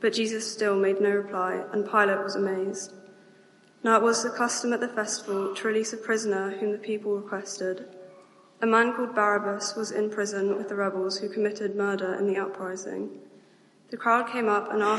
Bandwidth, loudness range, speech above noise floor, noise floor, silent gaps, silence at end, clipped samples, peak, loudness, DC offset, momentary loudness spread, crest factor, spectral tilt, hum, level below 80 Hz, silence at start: 11.5 kHz; 3 LU; 31 dB; -58 dBFS; none; 0 s; under 0.1%; -8 dBFS; -27 LUFS; under 0.1%; 10 LU; 20 dB; -3.5 dB/octave; none; -86 dBFS; 0 s